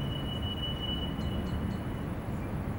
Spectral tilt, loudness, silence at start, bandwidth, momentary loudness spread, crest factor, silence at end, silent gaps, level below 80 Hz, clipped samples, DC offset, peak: -6.5 dB/octave; -35 LUFS; 0 s; 19.5 kHz; 3 LU; 12 dB; 0 s; none; -42 dBFS; under 0.1%; under 0.1%; -22 dBFS